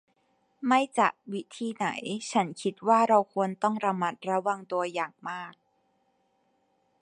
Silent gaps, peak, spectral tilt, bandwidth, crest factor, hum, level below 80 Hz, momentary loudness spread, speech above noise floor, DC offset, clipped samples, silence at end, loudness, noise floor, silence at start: none; -8 dBFS; -5 dB/octave; 11 kHz; 22 dB; none; -80 dBFS; 14 LU; 44 dB; under 0.1%; under 0.1%; 1.5 s; -28 LUFS; -72 dBFS; 0.6 s